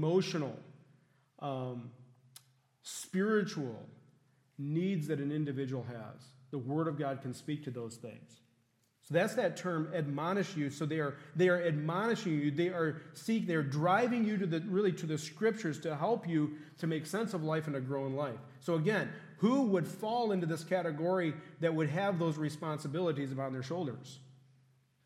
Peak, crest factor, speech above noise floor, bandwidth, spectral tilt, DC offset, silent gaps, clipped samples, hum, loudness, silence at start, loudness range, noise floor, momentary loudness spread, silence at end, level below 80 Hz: -16 dBFS; 20 dB; 40 dB; 15.5 kHz; -6.5 dB/octave; under 0.1%; none; under 0.1%; none; -35 LUFS; 0 s; 6 LU; -74 dBFS; 12 LU; 0.75 s; -84 dBFS